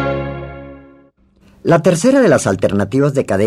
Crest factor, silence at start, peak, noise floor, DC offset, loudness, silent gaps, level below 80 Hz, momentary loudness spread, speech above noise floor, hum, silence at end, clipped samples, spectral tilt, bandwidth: 14 dB; 0 s; 0 dBFS; -50 dBFS; under 0.1%; -14 LUFS; none; -42 dBFS; 17 LU; 38 dB; none; 0 s; under 0.1%; -6 dB/octave; 13.5 kHz